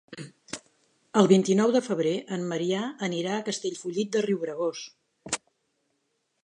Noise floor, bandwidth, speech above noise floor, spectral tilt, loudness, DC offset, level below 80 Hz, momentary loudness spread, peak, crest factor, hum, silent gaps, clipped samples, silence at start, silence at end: -76 dBFS; 11 kHz; 50 dB; -5 dB/octave; -27 LUFS; under 0.1%; -74 dBFS; 20 LU; -4 dBFS; 22 dB; none; none; under 0.1%; 0.1 s; 1.05 s